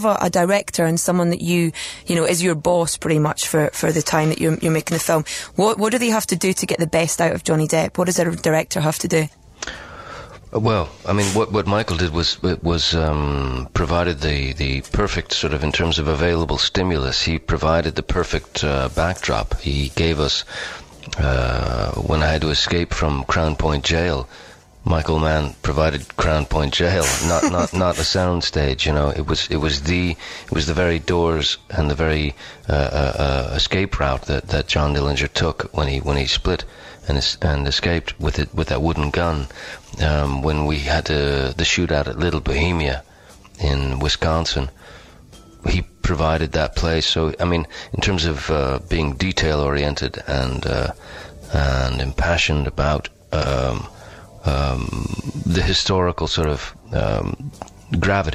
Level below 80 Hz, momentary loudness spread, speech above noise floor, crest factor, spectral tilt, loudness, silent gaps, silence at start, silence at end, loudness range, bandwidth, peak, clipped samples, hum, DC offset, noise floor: -28 dBFS; 7 LU; 25 dB; 16 dB; -4.5 dB/octave; -20 LUFS; none; 0 s; 0 s; 3 LU; 15.5 kHz; -4 dBFS; under 0.1%; none; under 0.1%; -45 dBFS